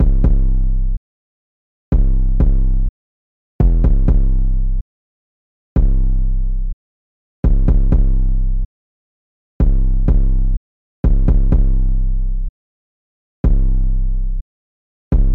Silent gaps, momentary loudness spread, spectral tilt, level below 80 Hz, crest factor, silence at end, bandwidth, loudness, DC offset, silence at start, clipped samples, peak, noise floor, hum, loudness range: 0.97-1.92 s, 2.89-3.59 s, 4.81-5.76 s, 6.73-7.43 s, 8.65-9.60 s, 10.57-11.03 s, 12.49-13.44 s, 14.41-15.11 s; 11 LU; -12 dB/octave; -14 dBFS; 10 dB; 0 s; 1.7 kHz; -19 LUFS; 0.6%; 0 s; under 0.1%; -4 dBFS; under -90 dBFS; none; 3 LU